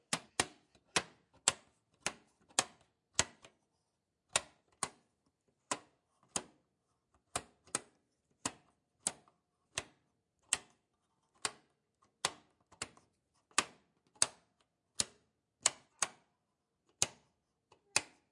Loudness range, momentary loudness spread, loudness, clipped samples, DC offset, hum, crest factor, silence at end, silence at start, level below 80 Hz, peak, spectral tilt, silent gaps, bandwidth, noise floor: 7 LU; 10 LU; -38 LUFS; under 0.1%; under 0.1%; none; 34 dB; 0.25 s; 0.1 s; -74 dBFS; -8 dBFS; 0 dB/octave; none; 11.5 kHz; -85 dBFS